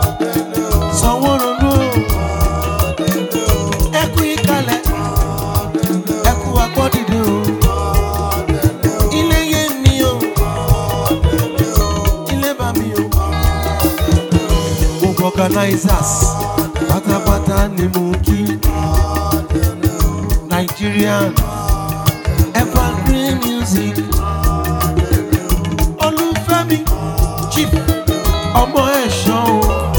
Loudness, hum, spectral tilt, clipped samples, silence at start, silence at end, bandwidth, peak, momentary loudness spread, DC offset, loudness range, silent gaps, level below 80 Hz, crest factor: -15 LUFS; none; -5.5 dB/octave; under 0.1%; 0 s; 0 s; 19.5 kHz; 0 dBFS; 4 LU; under 0.1%; 1 LU; none; -20 dBFS; 14 dB